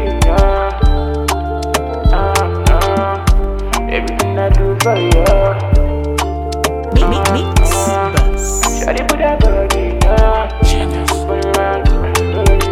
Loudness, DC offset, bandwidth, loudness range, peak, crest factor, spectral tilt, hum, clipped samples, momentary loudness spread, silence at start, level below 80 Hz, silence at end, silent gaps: -14 LUFS; under 0.1%; 15.5 kHz; 1 LU; 0 dBFS; 12 dB; -5 dB/octave; none; under 0.1%; 5 LU; 0 s; -14 dBFS; 0 s; none